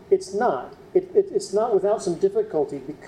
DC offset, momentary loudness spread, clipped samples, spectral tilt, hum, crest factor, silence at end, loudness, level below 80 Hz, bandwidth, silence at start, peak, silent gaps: under 0.1%; 5 LU; under 0.1%; -5.5 dB/octave; none; 16 dB; 0 s; -23 LUFS; -60 dBFS; 11.5 kHz; 0 s; -6 dBFS; none